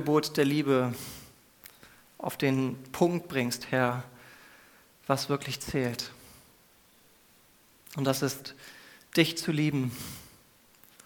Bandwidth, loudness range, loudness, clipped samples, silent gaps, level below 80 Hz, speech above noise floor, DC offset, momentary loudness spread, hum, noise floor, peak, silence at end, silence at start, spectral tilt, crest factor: 20 kHz; 5 LU; -30 LUFS; under 0.1%; none; -64 dBFS; 32 dB; under 0.1%; 22 LU; none; -61 dBFS; -8 dBFS; 0.8 s; 0 s; -5 dB/octave; 24 dB